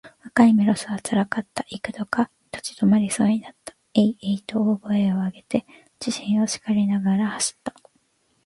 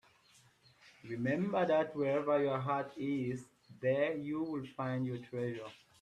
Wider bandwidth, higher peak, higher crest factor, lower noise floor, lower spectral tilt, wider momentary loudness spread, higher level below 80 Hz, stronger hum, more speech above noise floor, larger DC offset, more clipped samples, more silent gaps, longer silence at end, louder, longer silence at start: about the same, 11.5 kHz vs 11.5 kHz; first, -6 dBFS vs -20 dBFS; about the same, 18 dB vs 16 dB; about the same, -66 dBFS vs -67 dBFS; second, -5 dB/octave vs -7.5 dB/octave; first, 13 LU vs 10 LU; first, -60 dBFS vs -76 dBFS; neither; first, 44 dB vs 32 dB; neither; neither; neither; first, 0.75 s vs 0.25 s; first, -23 LUFS vs -36 LUFS; second, 0.05 s vs 0.85 s